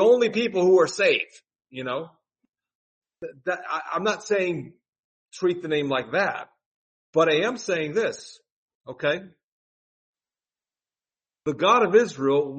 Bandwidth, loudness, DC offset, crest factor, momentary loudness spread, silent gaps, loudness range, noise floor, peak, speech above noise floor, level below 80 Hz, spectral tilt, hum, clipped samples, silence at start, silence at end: 8.4 kHz; -23 LUFS; under 0.1%; 20 dB; 16 LU; 2.75-3.01 s, 4.89-4.93 s, 4.99-5.26 s, 6.66-7.13 s, 8.52-8.68 s, 8.75-8.81 s, 9.44-10.13 s; 7 LU; under -90 dBFS; -6 dBFS; over 67 dB; -72 dBFS; -4.5 dB/octave; none; under 0.1%; 0 s; 0 s